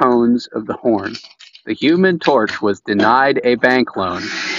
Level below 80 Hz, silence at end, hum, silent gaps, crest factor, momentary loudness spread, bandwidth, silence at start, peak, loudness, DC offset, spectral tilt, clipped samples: -56 dBFS; 0 s; none; none; 16 dB; 11 LU; 7.6 kHz; 0 s; 0 dBFS; -15 LUFS; under 0.1%; -3.5 dB/octave; under 0.1%